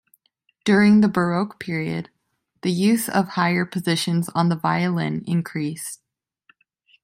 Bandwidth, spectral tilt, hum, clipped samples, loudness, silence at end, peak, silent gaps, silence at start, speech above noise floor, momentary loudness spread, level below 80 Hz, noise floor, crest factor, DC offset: 16 kHz; -5.5 dB/octave; none; under 0.1%; -21 LUFS; 1.1 s; -4 dBFS; none; 0.65 s; 47 dB; 12 LU; -62 dBFS; -68 dBFS; 18 dB; under 0.1%